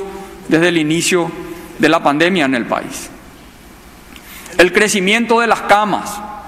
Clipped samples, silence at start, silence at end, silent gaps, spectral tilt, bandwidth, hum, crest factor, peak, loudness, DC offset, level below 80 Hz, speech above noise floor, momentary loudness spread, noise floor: under 0.1%; 0 s; 0 s; none; -4 dB/octave; 16 kHz; none; 16 dB; 0 dBFS; -13 LUFS; under 0.1%; -46 dBFS; 25 dB; 17 LU; -39 dBFS